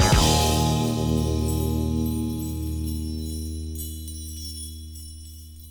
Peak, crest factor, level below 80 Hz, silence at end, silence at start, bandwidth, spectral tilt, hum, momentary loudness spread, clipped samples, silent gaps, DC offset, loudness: -6 dBFS; 18 dB; -32 dBFS; 0 s; 0 s; 19.5 kHz; -5 dB/octave; none; 19 LU; under 0.1%; none; under 0.1%; -25 LUFS